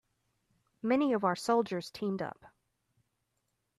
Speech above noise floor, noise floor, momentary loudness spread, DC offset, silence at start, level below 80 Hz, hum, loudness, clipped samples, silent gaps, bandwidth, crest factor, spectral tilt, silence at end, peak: 50 dB; -81 dBFS; 10 LU; under 0.1%; 0.85 s; -76 dBFS; none; -32 LUFS; under 0.1%; none; 13.5 kHz; 18 dB; -6 dB/octave; 1.3 s; -16 dBFS